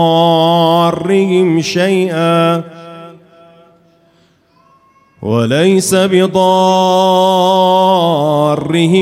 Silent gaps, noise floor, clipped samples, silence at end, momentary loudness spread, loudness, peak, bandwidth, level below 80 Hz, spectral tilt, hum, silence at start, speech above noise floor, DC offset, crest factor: none; -52 dBFS; under 0.1%; 0 s; 5 LU; -11 LUFS; 0 dBFS; 16 kHz; -56 dBFS; -5.5 dB/octave; none; 0 s; 41 dB; under 0.1%; 12 dB